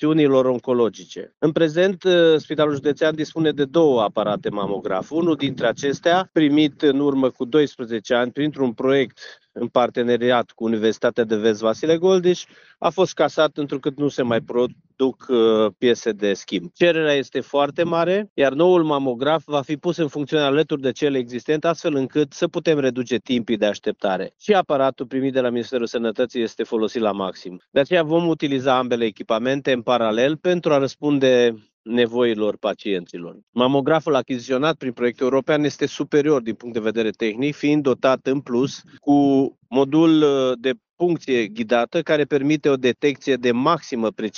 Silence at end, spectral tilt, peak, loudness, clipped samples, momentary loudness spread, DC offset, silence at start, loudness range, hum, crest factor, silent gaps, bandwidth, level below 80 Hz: 0 s; -4.5 dB/octave; -4 dBFS; -20 LUFS; under 0.1%; 8 LU; under 0.1%; 0 s; 3 LU; none; 16 dB; 18.30-18.36 s, 27.68-27.72 s, 31.73-31.84 s, 33.43-33.53 s; 7.2 kHz; -64 dBFS